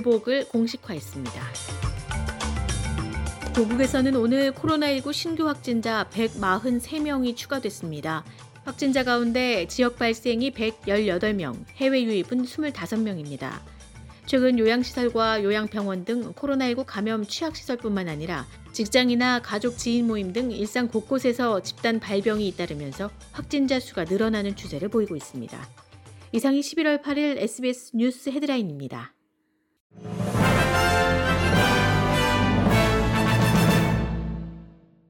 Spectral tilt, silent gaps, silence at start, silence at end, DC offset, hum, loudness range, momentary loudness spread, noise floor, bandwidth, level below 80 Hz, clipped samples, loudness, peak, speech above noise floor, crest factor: -5.5 dB/octave; 29.80-29.90 s; 0 s; 0.4 s; under 0.1%; none; 6 LU; 13 LU; -71 dBFS; 17.5 kHz; -40 dBFS; under 0.1%; -25 LUFS; -6 dBFS; 46 dB; 18 dB